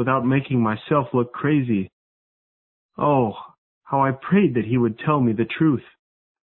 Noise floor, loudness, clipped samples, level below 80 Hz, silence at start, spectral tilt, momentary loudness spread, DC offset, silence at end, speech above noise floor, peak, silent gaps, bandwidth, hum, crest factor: under -90 dBFS; -21 LUFS; under 0.1%; -56 dBFS; 0 s; -12.5 dB/octave; 7 LU; under 0.1%; 0.65 s; over 70 dB; -6 dBFS; 1.93-2.89 s, 3.58-3.81 s; 4.2 kHz; none; 16 dB